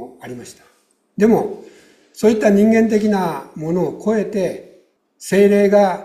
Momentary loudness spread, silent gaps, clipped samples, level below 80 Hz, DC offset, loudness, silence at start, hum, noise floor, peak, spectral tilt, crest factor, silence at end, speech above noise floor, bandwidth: 21 LU; none; under 0.1%; -56 dBFS; under 0.1%; -16 LUFS; 0 s; none; -53 dBFS; -2 dBFS; -6.5 dB/octave; 14 dB; 0 s; 37 dB; 14.5 kHz